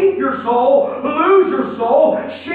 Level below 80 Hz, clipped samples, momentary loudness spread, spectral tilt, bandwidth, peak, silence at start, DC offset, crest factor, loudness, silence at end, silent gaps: -60 dBFS; under 0.1%; 7 LU; -8.5 dB/octave; 4.5 kHz; -2 dBFS; 0 s; under 0.1%; 12 dB; -15 LUFS; 0 s; none